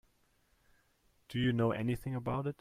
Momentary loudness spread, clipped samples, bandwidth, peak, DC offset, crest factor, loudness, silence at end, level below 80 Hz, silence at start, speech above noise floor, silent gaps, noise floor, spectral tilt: 6 LU; under 0.1%; 15.5 kHz; -20 dBFS; under 0.1%; 16 dB; -35 LUFS; 0.05 s; -60 dBFS; 1.3 s; 39 dB; none; -72 dBFS; -7.5 dB/octave